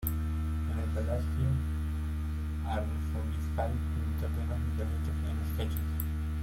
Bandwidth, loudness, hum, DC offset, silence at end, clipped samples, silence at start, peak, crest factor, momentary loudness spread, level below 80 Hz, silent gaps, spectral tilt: 16.5 kHz; -34 LUFS; none; under 0.1%; 0 s; under 0.1%; 0 s; -14 dBFS; 18 dB; 3 LU; -36 dBFS; none; -7.5 dB/octave